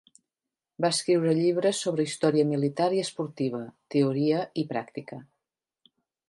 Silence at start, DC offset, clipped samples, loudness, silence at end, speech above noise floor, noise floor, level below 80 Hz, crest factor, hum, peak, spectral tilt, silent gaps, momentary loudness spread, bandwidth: 0.8 s; under 0.1%; under 0.1%; -26 LUFS; 1.05 s; 63 dB; -89 dBFS; -76 dBFS; 18 dB; none; -10 dBFS; -5.5 dB/octave; none; 12 LU; 11.5 kHz